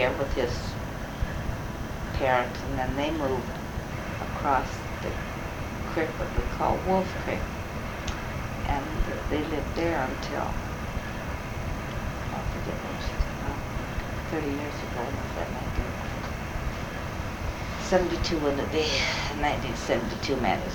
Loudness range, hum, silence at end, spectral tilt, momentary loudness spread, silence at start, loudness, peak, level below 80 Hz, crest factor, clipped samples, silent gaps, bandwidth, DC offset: 5 LU; none; 0 s; -5.5 dB/octave; 8 LU; 0 s; -30 LUFS; -6 dBFS; -36 dBFS; 22 dB; under 0.1%; none; 19 kHz; under 0.1%